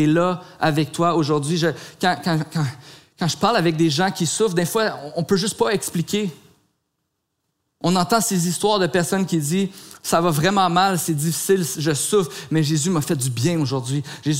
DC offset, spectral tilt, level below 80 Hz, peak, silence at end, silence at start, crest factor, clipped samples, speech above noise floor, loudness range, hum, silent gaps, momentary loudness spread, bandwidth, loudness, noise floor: 0.1%; -4.5 dB/octave; -58 dBFS; -4 dBFS; 0 s; 0 s; 18 dB; under 0.1%; 55 dB; 4 LU; none; none; 6 LU; 16 kHz; -20 LUFS; -75 dBFS